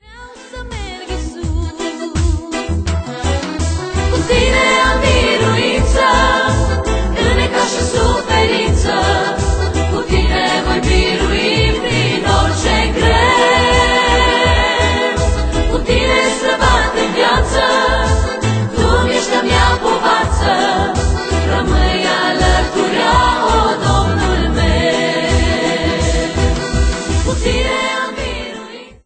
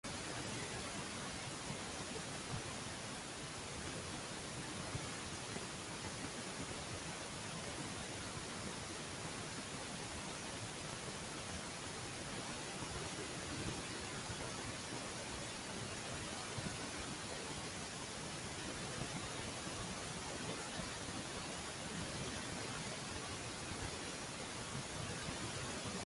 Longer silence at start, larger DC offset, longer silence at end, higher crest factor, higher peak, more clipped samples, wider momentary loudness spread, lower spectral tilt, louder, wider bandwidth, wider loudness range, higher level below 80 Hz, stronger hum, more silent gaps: about the same, 0.1 s vs 0.05 s; neither; first, 0.15 s vs 0 s; about the same, 14 dB vs 18 dB; first, 0 dBFS vs -28 dBFS; neither; first, 8 LU vs 2 LU; first, -4.5 dB/octave vs -3 dB/octave; first, -14 LUFS vs -44 LUFS; second, 9.2 kHz vs 11.5 kHz; first, 4 LU vs 1 LU; first, -20 dBFS vs -60 dBFS; neither; neither